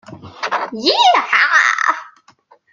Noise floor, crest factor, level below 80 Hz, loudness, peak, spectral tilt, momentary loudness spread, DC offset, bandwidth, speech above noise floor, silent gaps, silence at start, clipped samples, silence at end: -51 dBFS; 16 dB; -68 dBFS; -13 LUFS; 0 dBFS; -1.5 dB/octave; 11 LU; under 0.1%; 7.6 kHz; 37 dB; none; 0.1 s; under 0.1%; 0.65 s